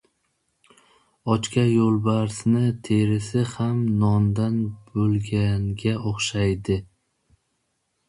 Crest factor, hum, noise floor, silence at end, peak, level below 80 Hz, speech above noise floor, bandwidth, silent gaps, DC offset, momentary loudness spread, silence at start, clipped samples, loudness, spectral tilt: 18 dB; none; -73 dBFS; 1.25 s; -6 dBFS; -46 dBFS; 52 dB; 11.5 kHz; none; under 0.1%; 6 LU; 1.25 s; under 0.1%; -23 LUFS; -6.5 dB/octave